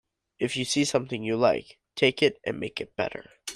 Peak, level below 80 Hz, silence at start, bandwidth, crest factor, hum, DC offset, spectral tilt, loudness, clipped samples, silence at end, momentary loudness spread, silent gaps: -6 dBFS; -64 dBFS; 0.4 s; 15 kHz; 20 dB; none; under 0.1%; -4 dB/octave; -27 LUFS; under 0.1%; 0 s; 10 LU; none